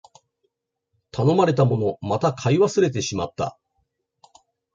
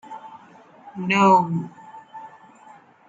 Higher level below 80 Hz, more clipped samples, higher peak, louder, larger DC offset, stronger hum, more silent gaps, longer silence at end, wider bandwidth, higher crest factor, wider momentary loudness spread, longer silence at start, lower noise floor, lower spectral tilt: first, -54 dBFS vs -72 dBFS; neither; about the same, -6 dBFS vs -4 dBFS; about the same, -21 LUFS vs -19 LUFS; neither; neither; neither; first, 1.25 s vs 0.8 s; about the same, 7.8 kHz vs 7.8 kHz; about the same, 18 dB vs 20 dB; second, 11 LU vs 26 LU; first, 1.15 s vs 0.1 s; first, -75 dBFS vs -49 dBFS; about the same, -6.5 dB/octave vs -6 dB/octave